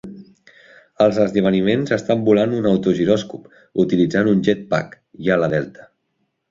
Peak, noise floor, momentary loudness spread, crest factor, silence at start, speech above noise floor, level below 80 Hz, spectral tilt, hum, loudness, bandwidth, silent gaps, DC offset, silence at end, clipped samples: -2 dBFS; -71 dBFS; 11 LU; 18 dB; 0.05 s; 53 dB; -54 dBFS; -7 dB/octave; none; -18 LUFS; 7.6 kHz; none; under 0.1%; 0.8 s; under 0.1%